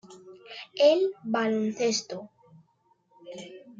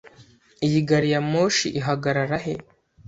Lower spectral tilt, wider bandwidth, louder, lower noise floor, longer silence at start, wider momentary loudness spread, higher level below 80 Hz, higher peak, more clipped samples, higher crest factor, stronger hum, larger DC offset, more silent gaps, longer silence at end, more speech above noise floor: second, -3.5 dB/octave vs -5 dB/octave; about the same, 7.8 kHz vs 8 kHz; second, -26 LUFS vs -22 LUFS; first, -68 dBFS vs -53 dBFS; about the same, 0.1 s vs 0.05 s; first, 22 LU vs 8 LU; second, -80 dBFS vs -56 dBFS; second, -10 dBFS vs -6 dBFS; neither; about the same, 20 dB vs 18 dB; neither; neither; neither; second, 0.1 s vs 0.45 s; first, 43 dB vs 31 dB